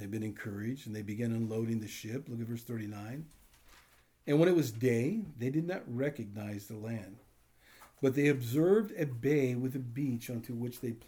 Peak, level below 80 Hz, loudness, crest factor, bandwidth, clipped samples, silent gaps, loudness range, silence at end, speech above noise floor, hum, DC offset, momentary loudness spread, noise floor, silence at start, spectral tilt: -14 dBFS; -70 dBFS; -34 LUFS; 20 dB; over 20 kHz; under 0.1%; none; 6 LU; 0.1 s; 31 dB; none; under 0.1%; 14 LU; -64 dBFS; 0 s; -7 dB/octave